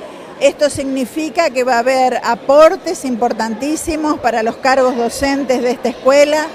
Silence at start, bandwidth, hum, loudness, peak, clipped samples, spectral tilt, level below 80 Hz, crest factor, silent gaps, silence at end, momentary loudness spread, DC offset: 0 s; 15.5 kHz; none; -14 LUFS; 0 dBFS; under 0.1%; -3.5 dB/octave; -44 dBFS; 14 dB; none; 0 s; 9 LU; under 0.1%